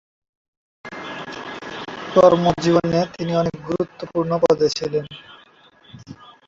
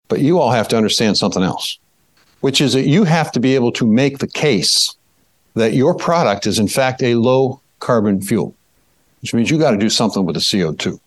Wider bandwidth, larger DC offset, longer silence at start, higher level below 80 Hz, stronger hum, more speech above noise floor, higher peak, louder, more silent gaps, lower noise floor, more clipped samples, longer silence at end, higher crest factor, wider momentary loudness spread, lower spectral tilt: second, 7.8 kHz vs 12.5 kHz; neither; first, 0.85 s vs 0.1 s; about the same, -52 dBFS vs -56 dBFS; neither; second, 33 dB vs 45 dB; about the same, 0 dBFS vs -2 dBFS; second, -19 LUFS vs -15 LUFS; neither; second, -51 dBFS vs -60 dBFS; neither; first, 0.35 s vs 0.1 s; first, 20 dB vs 14 dB; first, 20 LU vs 7 LU; first, -6 dB/octave vs -4.5 dB/octave